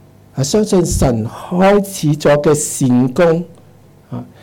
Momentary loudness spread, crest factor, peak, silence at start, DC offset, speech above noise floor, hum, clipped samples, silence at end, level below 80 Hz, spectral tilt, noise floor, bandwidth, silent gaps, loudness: 17 LU; 10 dB; -6 dBFS; 0.35 s; under 0.1%; 31 dB; none; under 0.1%; 0.2 s; -32 dBFS; -5.5 dB/octave; -44 dBFS; 18 kHz; none; -14 LUFS